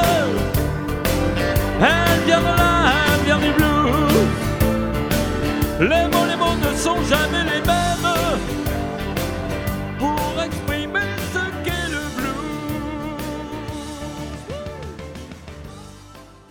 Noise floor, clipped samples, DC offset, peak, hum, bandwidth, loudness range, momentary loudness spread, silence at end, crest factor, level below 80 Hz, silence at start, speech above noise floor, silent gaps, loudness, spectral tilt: -43 dBFS; under 0.1%; under 0.1%; 0 dBFS; none; 19 kHz; 12 LU; 15 LU; 0.25 s; 20 dB; -30 dBFS; 0 s; 26 dB; none; -20 LUFS; -5 dB/octave